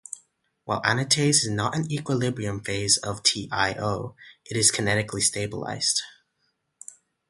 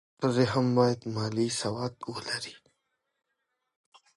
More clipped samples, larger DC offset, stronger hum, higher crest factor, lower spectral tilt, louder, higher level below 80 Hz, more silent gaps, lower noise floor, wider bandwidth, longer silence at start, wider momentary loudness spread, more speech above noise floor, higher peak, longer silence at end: neither; neither; neither; about the same, 24 dB vs 20 dB; second, -3 dB/octave vs -5.5 dB/octave; first, -24 LUFS vs -29 LUFS; first, -54 dBFS vs -66 dBFS; neither; second, -74 dBFS vs -81 dBFS; about the same, 12 kHz vs 11.5 kHz; about the same, 0.1 s vs 0.2 s; first, 20 LU vs 10 LU; second, 49 dB vs 53 dB; first, -4 dBFS vs -12 dBFS; second, 1.2 s vs 1.6 s